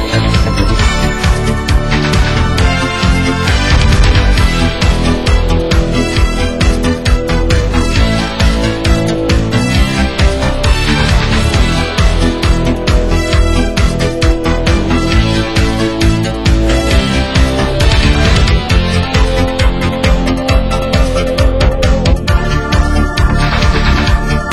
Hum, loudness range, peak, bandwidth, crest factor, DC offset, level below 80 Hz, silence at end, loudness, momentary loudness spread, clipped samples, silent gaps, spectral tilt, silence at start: none; 1 LU; 0 dBFS; 13 kHz; 10 dB; under 0.1%; -14 dBFS; 0 s; -12 LUFS; 3 LU; under 0.1%; none; -5.5 dB/octave; 0 s